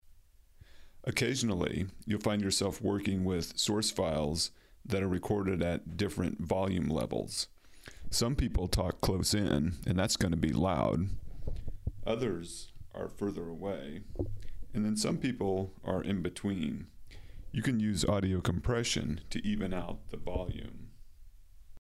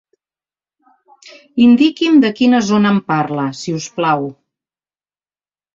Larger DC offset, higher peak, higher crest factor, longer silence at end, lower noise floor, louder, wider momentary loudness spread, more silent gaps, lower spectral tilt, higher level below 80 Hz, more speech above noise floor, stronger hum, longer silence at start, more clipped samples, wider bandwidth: neither; second, -12 dBFS vs -2 dBFS; first, 22 dB vs 14 dB; second, 0 s vs 1.45 s; second, -58 dBFS vs under -90 dBFS; second, -33 LUFS vs -14 LUFS; about the same, 13 LU vs 12 LU; neither; about the same, -5 dB/octave vs -5.5 dB/octave; first, -46 dBFS vs -58 dBFS; second, 26 dB vs over 77 dB; neither; second, 0.05 s vs 1.55 s; neither; first, 16 kHz vs 7.6 kHz